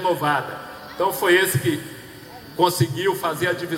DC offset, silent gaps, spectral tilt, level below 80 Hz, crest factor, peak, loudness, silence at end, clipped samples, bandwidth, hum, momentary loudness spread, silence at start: under 0.1%; none; -4.5 dB/octave; -60 dBFS; 18 dB; -4 dBFS; -21 LUFS; 0 s; under 0.1%; 17 kHz; none; 19 LU; 0 s